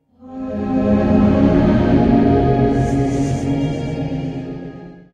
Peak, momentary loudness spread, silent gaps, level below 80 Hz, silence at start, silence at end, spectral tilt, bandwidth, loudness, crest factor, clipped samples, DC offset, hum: -2 dBFS; 16 LU; none; -30 dBFS; 0.2 s; 0.15 s; -8.5 dB/octave; 9.4 kHz; -16 LUFS; 14 dB; under 0.1%; under 0.1%; none